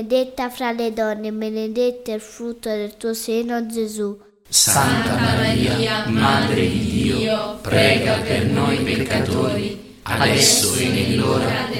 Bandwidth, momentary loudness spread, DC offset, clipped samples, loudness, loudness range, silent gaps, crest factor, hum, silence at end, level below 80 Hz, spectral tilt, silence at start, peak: 17 kHz; 12 LU; under 0.1%; under 0.1%; -19 LUFS; 7 LU; none; 18 dB; none; 0 s; -44 dBFS; -4 dB/octave; 0 s; -2 dBFS